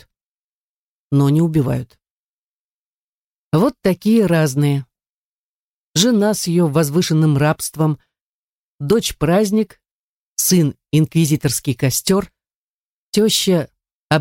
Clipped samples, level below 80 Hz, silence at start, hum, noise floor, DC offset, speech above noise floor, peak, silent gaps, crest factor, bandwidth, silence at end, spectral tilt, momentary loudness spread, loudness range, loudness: under 0.1%; -48 dBFS; 1.1 s; none; under -90 dBFS; under 0.1%; over 74 dB; -2 dBFS; 2.11-3.51 s, 5.07-5.94 s, 8.21-8.79 s, 9.91-10.36 s, 12.55-13.13 s, 13.94-14.08 s; 16 dB; 17 kHz; 0 s; -5 dB/octave; 7 LU; 2 LU; -17 LUFS